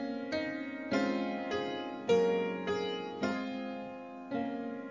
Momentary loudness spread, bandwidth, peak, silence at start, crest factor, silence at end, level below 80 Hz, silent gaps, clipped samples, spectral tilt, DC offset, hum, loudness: 10 LU; 7.6 kHz; -16 dBFS; 0 s; 18 dB; 0 s; -68 dBFS; none; under 0.1%; -5.5 dB/octave; under 0.1%; none; -35 LUFS